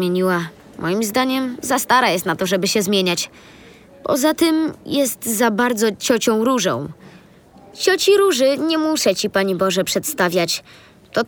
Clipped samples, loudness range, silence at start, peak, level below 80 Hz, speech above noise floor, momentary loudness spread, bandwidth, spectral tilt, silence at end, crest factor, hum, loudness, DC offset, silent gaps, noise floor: under 0.1%; 2 LU; 0 s; -2 dBFS; -58 dBFS; 28 dB; 8 LU; over 20 kHz; -3.5 dB/octave; 0 s; 18 dB; none; -18 LUFS; under 0.1%; none; -46 dBFS